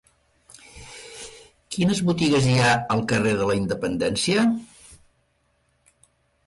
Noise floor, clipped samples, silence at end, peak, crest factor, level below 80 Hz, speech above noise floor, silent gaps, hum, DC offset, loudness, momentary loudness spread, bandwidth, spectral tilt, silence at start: -67 dBFS; under 0.1%; 1.5 s; -8 dBFS; 16 dB; -52 dBFS; 46 dB; none; none; under 0.1%; -22 LUFS; 21 LU; 11.5 kHz; -5 dB/octave; 0.75 s